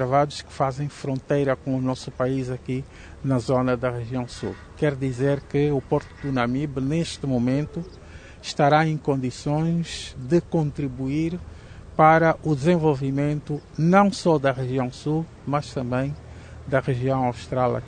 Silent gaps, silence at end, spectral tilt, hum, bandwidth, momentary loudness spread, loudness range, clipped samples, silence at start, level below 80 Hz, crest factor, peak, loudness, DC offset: none; 0 s; -7 dB/octave; none; 9.6 kHz; 13 LU; 5 LU; under 0.1%; 0 s; -46 dBFS; 20 dB; -2 dBFS; -24 LUFS; under 0.1%